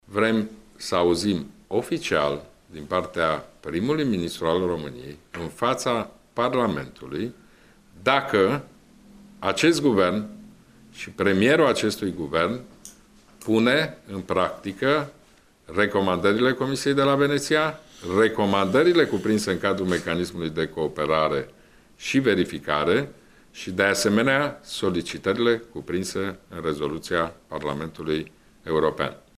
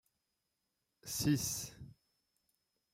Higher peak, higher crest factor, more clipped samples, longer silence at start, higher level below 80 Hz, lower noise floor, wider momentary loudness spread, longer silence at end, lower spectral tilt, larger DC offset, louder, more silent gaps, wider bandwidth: first, -4 dBFS vs -22 dBFS; about the same, 20 dB vs 22 dB; neither; second, 0.1 s vs 1.05 s; first, -54 dBFS vs -66 dBFS; second, -56 dBFS vs -86 dBFS; second, 14 LU vs 23 LU; second, 0.2 s vs 1 s; about the same, -5 dB/octave vs -4 dB/octave; neither; first, -24 LUFS vs -36 LUFS; neither; about the same, 15.5 kHz vs 16 kHz